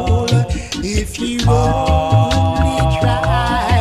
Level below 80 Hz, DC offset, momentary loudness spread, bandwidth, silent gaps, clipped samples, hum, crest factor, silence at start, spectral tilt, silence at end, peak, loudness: -22 dBFS; under 0.1%; 6 LU; 14 kHz; none; under 0.1%; none; 12 dB; 0 s; -6 dB/octave; 0 s; -2 dBFS; -16 LUFS